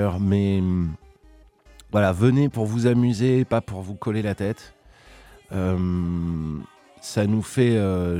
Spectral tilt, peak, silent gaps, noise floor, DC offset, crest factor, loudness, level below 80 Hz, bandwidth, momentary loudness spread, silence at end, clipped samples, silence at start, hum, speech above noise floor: -7.5 dB/octave; -4 dBFS; none; -52 dBFS; under 0.1%; 18 dB; -23 LUFS; -46 dBFS; 14.5 kHz; 12 LU; 0 s; under 0.1%; 0 s; none; 31 dB